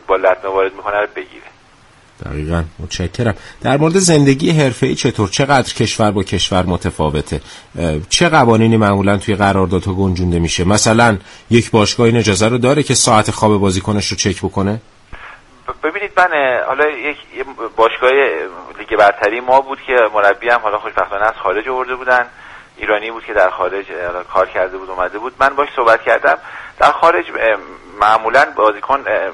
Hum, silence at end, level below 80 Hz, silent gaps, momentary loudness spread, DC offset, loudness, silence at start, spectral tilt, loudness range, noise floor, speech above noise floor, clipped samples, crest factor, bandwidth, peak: none; 0 s; -38 dBFS; none; 12 LU; under 0.1%; -14 LUFS; 0.1 s; -4.5 dB/octave; 5 LU; -46 dBFS; 32 dB; under 0.1%; 14 dB; 11.5 kHz; 0 dBFS